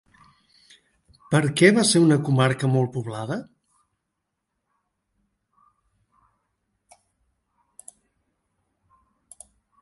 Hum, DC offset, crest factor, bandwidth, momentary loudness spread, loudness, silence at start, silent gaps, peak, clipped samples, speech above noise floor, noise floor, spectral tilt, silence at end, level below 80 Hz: none; under 0.1%; 24 dB; 11.5 kHz; 14 LU; -20 LUFS; 1.3 s; none; -2 dBFS; under 0.1%; 60 dB; -80 dBFS; -5 dB/octave; 6.4 s; -66 dBFS